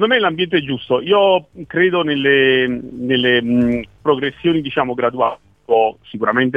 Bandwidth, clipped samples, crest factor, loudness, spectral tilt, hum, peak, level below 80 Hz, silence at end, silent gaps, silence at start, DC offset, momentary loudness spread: 5 kHz; under 0.1%; 16 dB; -16 LUFS; -7.5 dB/octave; none; 0 dBFS; -50 dBFS; 0 s; none; 0 s; 0.1%; 7 LU